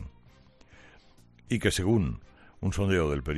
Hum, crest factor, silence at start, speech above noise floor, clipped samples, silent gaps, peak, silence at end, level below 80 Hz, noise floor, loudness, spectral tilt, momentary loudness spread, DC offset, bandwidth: none; 20 dB; 0 s; 30 dB; under 0.1%; none; -12 dBFS; 0 s; -44 dBFS; -57 dBFS; -28 LUFS; -5.5 dB/octave; 12 LU; under 0.1%; 13.5 kHz